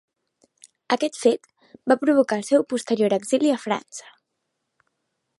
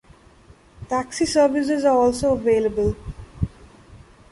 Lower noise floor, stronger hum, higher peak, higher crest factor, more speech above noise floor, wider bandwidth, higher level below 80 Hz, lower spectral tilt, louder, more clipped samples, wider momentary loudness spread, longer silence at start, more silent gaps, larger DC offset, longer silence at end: first, -78 dBFS vs -50 dBFS; neither; about the same, -4 dBFS vs -6 dBFS; about the same, 20 dB vs 16 dB; first, 57 dB vs 31 dB; about the same, 11.5 kHz vs 11.5 kHz; second, -76 dBFS vs -40 dBFS; about the same, -4.5 dB/octave vs -5.5 dB/octave; about the same, -22 LUFS vs -21 LUFS; neither; about the same, 10 LU vs 12 LU; about the same, 0.9 s vs 0.8 s; neither; neither; first, 1.4 s vs 0.35 s